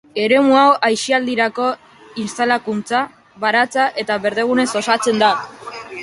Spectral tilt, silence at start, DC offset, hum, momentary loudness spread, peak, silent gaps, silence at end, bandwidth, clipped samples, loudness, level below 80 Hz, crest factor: -3.5 dB/octave; 0.15 s; under 0.1%; none; 16 LU; -2 dBFS; none; 0 s; 11.5 kHz; under 0.1%; -16 LUFS; -64 dBFS; 16 dB